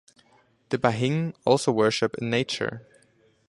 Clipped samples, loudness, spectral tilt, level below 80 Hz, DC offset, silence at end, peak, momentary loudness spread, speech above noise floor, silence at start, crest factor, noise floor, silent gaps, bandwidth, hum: under 0.1%; -25 LUFS; -5.5 dB/octave; -62 dBFS; under 0.1%; 0.7 s; -4 dBFS; 9 LU; 38 dB; 0.7 s; 22 dB; -62 dBFS; none; 11.5 kHz; none